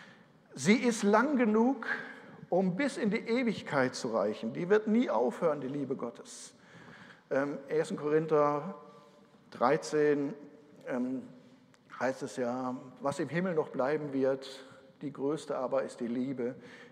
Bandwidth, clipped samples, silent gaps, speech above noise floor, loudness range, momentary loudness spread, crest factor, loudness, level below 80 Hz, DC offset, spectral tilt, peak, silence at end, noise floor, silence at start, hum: 12.5 kHz; under 0.1%; none; 28 dB; 5 LU; 19 LU; 20 dB; -32 LUFS; -82 dBFS; under 0.1%; -5.5 dB/octave; -12 dBFS; 0.05 s; -60 dBFS; 0 s; none